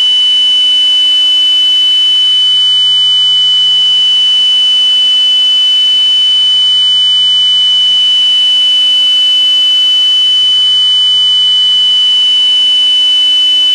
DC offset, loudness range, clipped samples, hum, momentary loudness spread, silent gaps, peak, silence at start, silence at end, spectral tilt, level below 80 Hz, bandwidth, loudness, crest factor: under 0.1%; 0 LU; under 0.1%; none; 0 LU; none; -4 dBFS; 0 s; 0 s; 2 dB/octave; -54 dBFS; 16 kHz; -5 LUFS; 4 dB